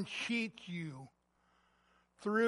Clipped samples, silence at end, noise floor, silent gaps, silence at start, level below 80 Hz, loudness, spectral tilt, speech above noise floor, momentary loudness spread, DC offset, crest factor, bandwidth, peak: under 0.1%; 0 s; -75 dBFS; none; 0 s; -80 dBFS; -40 LUFS; -5 dB/octave; 37 dB; 16 LU; under 0.1%; 18 dB; 11.5 kHz; -20 dBFS